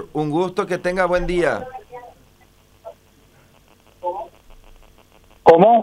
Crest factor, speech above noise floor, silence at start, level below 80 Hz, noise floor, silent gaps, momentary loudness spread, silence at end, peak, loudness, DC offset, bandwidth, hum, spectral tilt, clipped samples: 20 dB; 35 dB; 0 s; -42 dBFS; -53 dBFS; none; 25 LU; 0 s; 0 dBFS; -18 LUFS; under 0.1%; 12.5 kHz; 50 Hz at -60 dBFS; -6.5 dB/octave; under 0.1%